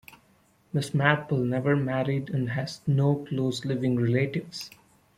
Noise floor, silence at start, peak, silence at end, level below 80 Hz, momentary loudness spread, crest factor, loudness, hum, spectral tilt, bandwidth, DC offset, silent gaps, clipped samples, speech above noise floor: -63 dBFS; 0.1 s; -6 dBFS; 0.5 s; -62 dBFS; 9 LU; 22 dB; -27 LUFS; none; -7 dB/octave; 14.5 kHz; under 0.1%; none; under 0.1%; 37 dB